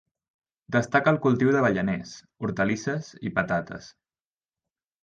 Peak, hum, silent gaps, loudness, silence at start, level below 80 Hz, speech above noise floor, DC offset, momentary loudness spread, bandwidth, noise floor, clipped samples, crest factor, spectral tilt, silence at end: -8 dBFS; none; none; -25 LUFS; 0.7 s; -58 dBFS; over 65 dB; under 0.1%; 12 LU; 9 kHz; under -90 dBFS; under 0.1%; 20 dB; -6.5 dB/octave; 1.15 s